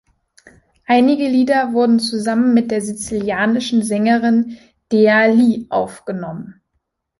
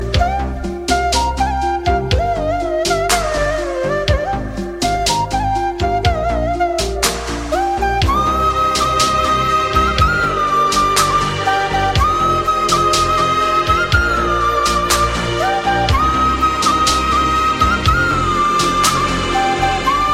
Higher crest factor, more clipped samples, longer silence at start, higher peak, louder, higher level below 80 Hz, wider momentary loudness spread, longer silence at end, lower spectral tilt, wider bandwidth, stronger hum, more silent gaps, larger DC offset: about the same, 14 dB vs 14 dB; neither; first, 0.9 s vs 0 s; about the same, -2 dBFS vs 0 dBFS; about the same, -16 LUFS vs -15 LUFS; second, -56 dBFS vs -26 dBFS; first, 13 LU vs 5 LU; first, 0.7 s vs 0 s; about the same, -5 dB/octave vs -4 dB/octave; second, 11.5 kHz vs 16.5 kHz; neither; neither; neither